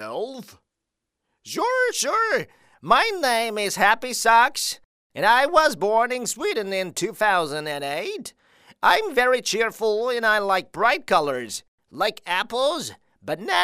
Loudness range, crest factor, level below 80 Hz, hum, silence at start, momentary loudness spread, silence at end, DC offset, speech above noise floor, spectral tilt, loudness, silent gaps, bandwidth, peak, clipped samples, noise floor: 4 LU; 20 dB; -60 dBFS; none; 0 s; 15 LU; 0 s; under 0.1%; 61 dB; -2 dB/octave; -21 LUFS; 4.85-5.10 s, 11.68-11.78 s; 16 kHz; -2 dBFS; under 0.1%; -83 dBFS